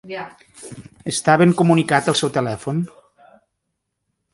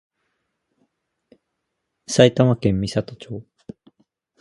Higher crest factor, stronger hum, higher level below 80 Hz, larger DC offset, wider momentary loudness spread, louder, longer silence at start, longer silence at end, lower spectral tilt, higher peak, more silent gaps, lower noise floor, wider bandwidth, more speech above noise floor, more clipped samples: about the same, 20 dB vs 24 dB; neither; second, -58 dBFS vs -48 dBFS; neither; about the same, 23 LU vs 21 LU; about the same, -18 LUFS vs -18 LUFS; second, 0.05 s vs 2.1 s; first, 1.45 s vs 1 s; about the same, -5 dB/octave vs -6 dB/octave; about the same, 0 dBFS vs 0 dBFS; neither; about the same, -76 dBFS vs -78 dBFS; about the same, 11.5 kHz vs 11.5 kHz; about the same, 58 dB vs 59 dB; neither